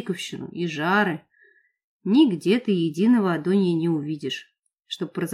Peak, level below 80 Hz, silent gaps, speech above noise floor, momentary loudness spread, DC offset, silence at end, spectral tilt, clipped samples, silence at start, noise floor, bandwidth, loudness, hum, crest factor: -8 dBFS; -76 dBFS; 1.84-2.00 s, 4.59-4.63 s; 38 dB; 13 LU; under 0.1%; 0 s; -6.5 dB/octave; under 0.1%; 0 s; -60 dBFS; 13 kHz; -23 LUFS; none; 16 dB